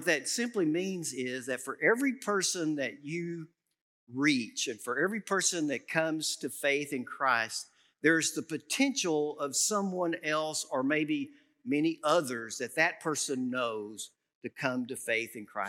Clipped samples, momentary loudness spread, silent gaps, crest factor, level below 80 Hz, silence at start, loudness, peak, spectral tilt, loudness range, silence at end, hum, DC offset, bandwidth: under 0.1%; 10 LU; 3.81-4.07 s, 14.35-14.41 s; 22 dB; under -90 dBFS; 0 s; -31 LUFS; -10 dBFS; -3 dB/octave; 2 LU; 0 s; none; under 0.1%; 16.5 kHz